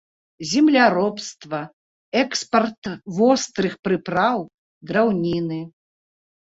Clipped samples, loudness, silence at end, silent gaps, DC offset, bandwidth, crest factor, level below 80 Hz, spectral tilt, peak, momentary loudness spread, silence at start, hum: under 0.1%; -21 LUFS; 0.8 s; 1.73-2.12 s, 2.78-2.82 s, 3.79-3.83 s, 4.54-4.81 s; under 0.1%; 8 kHz; 20 dB; -60 dBFS; -4.5 dB/octave; -2 dBFS; 16 LU; 0.4 s; none